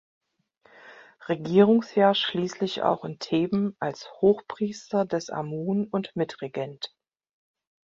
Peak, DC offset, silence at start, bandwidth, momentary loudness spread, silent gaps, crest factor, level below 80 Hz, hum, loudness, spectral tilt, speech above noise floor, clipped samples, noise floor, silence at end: -6 dBFS; under 0.1%; 0.85 s; 7.6 kHz; 13 LU; none; 20 dB; -68 dBFS; none; -26 LUFS; -6 dB/octave; 38 dB; under 0.1%; -63 dBFS; 0.95 s